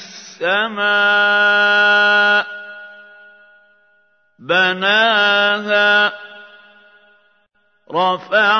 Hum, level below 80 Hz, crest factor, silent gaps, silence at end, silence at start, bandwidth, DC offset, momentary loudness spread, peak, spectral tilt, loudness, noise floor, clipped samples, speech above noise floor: none; -78 dBFS; 16 dB; none; 0 s; 0 s; 6.6 kHz; under 0.1%; 15 LU; -2 dBFS; -3 dB/octave; -14 LUFS; -61 dBFS; under 0.1%; 47 dB